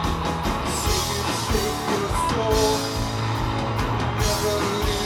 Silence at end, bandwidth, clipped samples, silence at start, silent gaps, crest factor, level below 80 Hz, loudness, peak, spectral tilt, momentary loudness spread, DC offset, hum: 0 s; 19 kHz; under 0.1%; 0 s; none; 16 dB; -32 dBFS; -23 LUFS; -6 dBFS; -4 dB/octave; 4 LU; under 0.1%; none